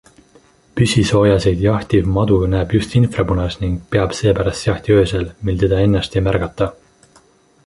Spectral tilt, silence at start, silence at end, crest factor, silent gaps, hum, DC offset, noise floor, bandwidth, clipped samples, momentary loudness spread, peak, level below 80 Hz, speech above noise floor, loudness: -6.5 dB/octave; 0.75 s; 0.95 s; 14 dB; none; none; under 0.1%; -52 dBFS; 11.5 kHz; under 0.1%; 8 LU; -2 dBFS; -30 dBFS; 37 dB; -16 LUFS